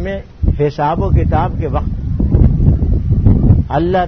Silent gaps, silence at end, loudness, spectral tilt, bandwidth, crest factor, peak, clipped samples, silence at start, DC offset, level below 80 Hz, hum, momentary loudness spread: none; 0 s; -14 LUFS; -10.5 dB/octave; 6 kHz; 12 dB; 0 dBFS; 0.1%; 0 s; 0.4%; -16 dBFS; none; 7 LU